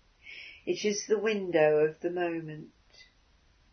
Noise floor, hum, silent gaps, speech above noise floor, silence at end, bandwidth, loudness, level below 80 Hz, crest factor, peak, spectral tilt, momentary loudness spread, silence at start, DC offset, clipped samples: -65 dBFS; none; none; 36 dB; 0.7 s; 6.6 kHz; -29 LUFS; -70 dBFS; 20 dB; -12 dBFS; -4.5 dB/octave; 20 LU; 0.25 s; under 0.1%; under 0.1%